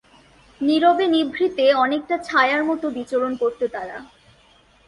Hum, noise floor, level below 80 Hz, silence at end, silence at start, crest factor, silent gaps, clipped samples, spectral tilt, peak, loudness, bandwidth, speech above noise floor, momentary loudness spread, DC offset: none; -55 dBFS; -60 dBFS; 0.85 s; 0.6 s; 16 dB; none; under 0.1%; -4.5 dB/octave; -4 dBFS; -20 LUFS; 11.5 kHz; 35 dB; 10 LU; under 0.1%